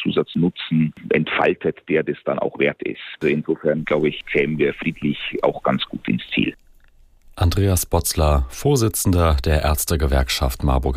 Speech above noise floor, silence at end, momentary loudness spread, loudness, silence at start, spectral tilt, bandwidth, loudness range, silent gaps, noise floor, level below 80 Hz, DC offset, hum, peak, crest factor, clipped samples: 31 dB; 0 s; 6 LU; -20 LUFS; 0 s; -5 dB/octave; 15.5 kHz; 3 LU; none; -51 dBFS; -30 dBFS; under 0.1%; none; -4 dBFS; 16 dB; under 0.1%